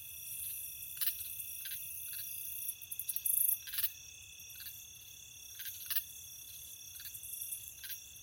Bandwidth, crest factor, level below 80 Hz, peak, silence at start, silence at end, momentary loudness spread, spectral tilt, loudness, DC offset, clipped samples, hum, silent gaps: 17 kHz; 28 dB; -72 dBFS; -14 dBFS; 0 s; 0 s; 16 LU; 2 dB/octave; -38 LUFS; under 0.1%; under 0.1%; none; none